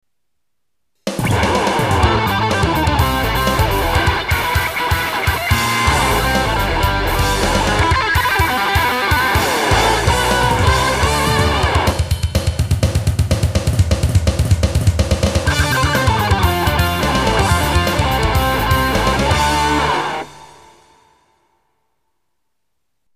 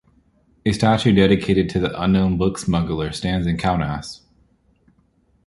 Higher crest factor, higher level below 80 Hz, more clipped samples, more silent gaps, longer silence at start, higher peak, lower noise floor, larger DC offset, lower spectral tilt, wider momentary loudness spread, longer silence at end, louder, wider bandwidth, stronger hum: about the same, 16 dB vs 18 dB; first, -24 dBFS vs -38 dBFS; neither; neither; first, 1.05 s vs 0.65 s; about the same, 0 dBFS vs -2 dBFS; first, -78 dBFS vs -61 dBFS; first, 0.3% vs under 0.1%; second, -4.5 dB/octave vs -6.5 dB/octave; second, 3 LU vs 10 LU; first, 2.7 s vs 1.3 s; first, -15 LUFS vs -19 LUFS; first, 15.5 kHz vs 11.5 kHz; neither